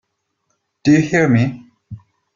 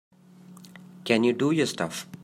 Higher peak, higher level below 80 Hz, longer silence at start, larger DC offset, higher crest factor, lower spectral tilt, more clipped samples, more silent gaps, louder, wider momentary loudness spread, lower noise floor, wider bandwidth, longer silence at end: first, -2 dBFS vs -6 dBFS; first, -54 dBFS vs -72 dBFS; first, 0.85 s vs 0.5 s; neither; about the same, 16 dB vs 20 dB; first, -7 dB/octave vs -5 dB/octave; neither; neither; first, -15 LUFS vs -25 LUFS; second, 9 LU vs 22 LU; first, -70 dBFS vs -50 dBFS; second, 7.4 kHz vs 16 kHz; first, 0.4 s vs 0.1 s